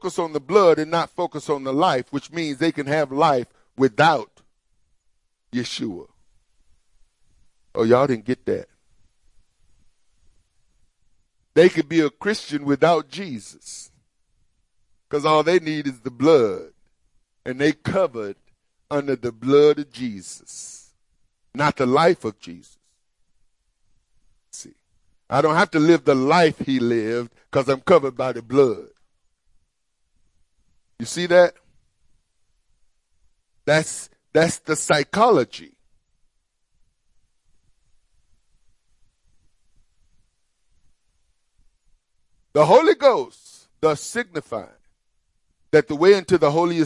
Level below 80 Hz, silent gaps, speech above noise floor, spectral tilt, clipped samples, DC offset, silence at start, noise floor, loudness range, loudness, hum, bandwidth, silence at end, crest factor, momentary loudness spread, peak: -62 dBFS; none; 52 dB; -5 dB/octave; under 0.1%; under 0.1%; 0.05 s; -72 dBFS; 6 LU; -20 LUFS; none; 11.5 kHz; 0 s; 20 dB; 18 LU; -2 dBFS